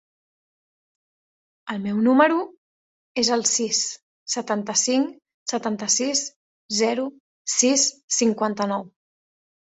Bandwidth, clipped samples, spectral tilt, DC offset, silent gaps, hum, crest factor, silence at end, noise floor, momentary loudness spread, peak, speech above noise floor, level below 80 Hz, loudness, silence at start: 8.4 kHz; under 0.1%; -2 dB/octave; under 0.1%; 2.57-3.15 s, 4.02-4.26 s, 5.34-5.46 s, 6.36-6.69 s, 7.20-7.45 s, 8.03-8.08 s; none; 22 dB; 0.75 s; under -90 dBFS; 15 LU; -4 dBFS; over 68 dB; -70 dBFS; -22 LUFS; 1.65 s